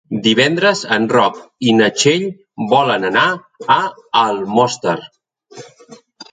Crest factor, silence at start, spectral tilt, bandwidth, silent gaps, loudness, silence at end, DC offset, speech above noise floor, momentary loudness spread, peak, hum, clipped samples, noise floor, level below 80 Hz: 16 dB; 0.1 s; -4 dB/octave; 9.6 kHz; none; -15 LUFS; 0.1 s; under 0.1%; 28 dB; 8 LU; 0 dBFS; none; under 0.1%; -43 dBFS; -60 dBFS